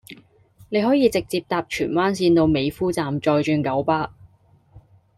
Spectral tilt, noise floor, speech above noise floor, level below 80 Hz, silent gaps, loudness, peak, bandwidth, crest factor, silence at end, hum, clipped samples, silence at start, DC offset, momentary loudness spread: -6 dB/octave; -56 dBFS; 35 dB; -50 dBFS; none; -21 LUFS; -6 dBFS; 15 kHz; 16 dB; 0.4 s; none; under 0.1%; 0.1 s; under 0.1%; 7 LU